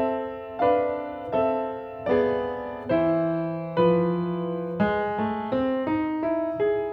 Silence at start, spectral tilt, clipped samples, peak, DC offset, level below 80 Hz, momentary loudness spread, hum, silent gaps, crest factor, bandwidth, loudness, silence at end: 0 s; -10 dB/octave; under 0.1%; -10 dBFS; under 0.1%; -54 dBFS; 8 LU; none; none; 16 dB; 5.4 kHz; -26 LUFS; 0 s